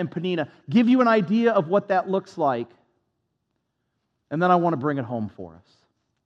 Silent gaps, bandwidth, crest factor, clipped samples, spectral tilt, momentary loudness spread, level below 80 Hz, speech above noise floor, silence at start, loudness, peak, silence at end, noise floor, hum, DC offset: none; 7.4 kHz; 18 dB; under 0.1%; -8 dB/octave; 14 LU; -76 dBFS; 54 dB; 0 s; -22 LUFS; -6 dBFS; 0.75 s; -76 dBFS; none; under 0.1%